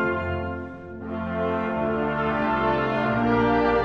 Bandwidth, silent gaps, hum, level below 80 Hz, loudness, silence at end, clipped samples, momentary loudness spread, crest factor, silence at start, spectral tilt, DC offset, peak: 6.6 kHz; none; none; -44 dBFS; -24 LUFS; 0 s; under 0.1%; 12 LU; 14 dB; 0 s; -8.5 dB/octave; 0.2%; -10 dBFS